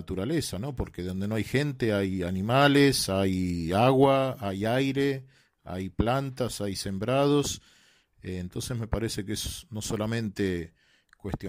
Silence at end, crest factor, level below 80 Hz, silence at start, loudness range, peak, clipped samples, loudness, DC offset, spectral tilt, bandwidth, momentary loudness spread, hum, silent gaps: 0 s; 20 dB; -48 dBFS; 0 s; 8 LU; -8 dBFS; under 0.1%; -27 LUFS; under 0.1%; -5.5 dB/octave; 16 kHz; 14 LU; none; none